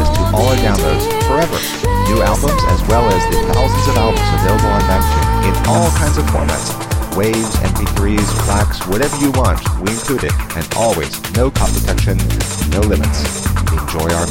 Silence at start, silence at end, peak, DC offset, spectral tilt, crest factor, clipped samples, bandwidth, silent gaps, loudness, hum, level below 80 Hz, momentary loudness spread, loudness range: 0 s; 0 s; 0 dBFS; 0.8%; -5 dB/octave; 14 dB; under 0.1%; 17 kHz; none; -15 LUFS; none; -18 dBFS; 4 LU; 3 LU